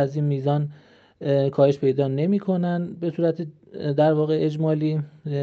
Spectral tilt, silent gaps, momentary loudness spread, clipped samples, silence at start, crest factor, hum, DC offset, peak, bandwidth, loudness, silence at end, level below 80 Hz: -9.5 dB/octave; none; 11 LU; under 0.1%; 0 s; 16 dB; none; under 0.1%; -6 dBFS; 6.6 kHz; -23 LUFS; 0 s; -70 dBFS